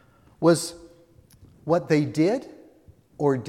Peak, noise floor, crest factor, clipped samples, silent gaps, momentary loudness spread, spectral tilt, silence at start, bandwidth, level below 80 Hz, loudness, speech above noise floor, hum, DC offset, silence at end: -6 dBFS; -55 dBFS; 20 dB; under 0.1%; none; 10 LU; -6 dB/octave; 0.4 s; 15.5 kHz; -62 dBFS; -24 LUFS; 33 dB; none; under 0.1%; 0 s